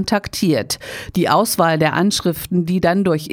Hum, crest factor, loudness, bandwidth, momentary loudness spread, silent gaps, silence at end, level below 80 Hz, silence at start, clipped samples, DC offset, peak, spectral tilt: none; 16 dB; -17 LUFS; over 20 kHz; 6 LU; none; 0 s; -46 dBFS; 0 s; under 0.1%; under 0.1%; -2 dBFS; -5 dB/octave